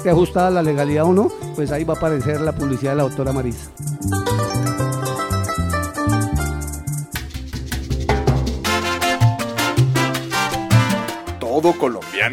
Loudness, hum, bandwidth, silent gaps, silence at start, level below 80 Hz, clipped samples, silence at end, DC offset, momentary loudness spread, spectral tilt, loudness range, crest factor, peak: -20 LUFS; none; 16.5 kHz; none; 0 s; -32 dBFS; under 0.1%; 0 s; under 0.1%; 10 LU; -5.5 dB/octave; 4 LU; 16 dB; -2 dBFS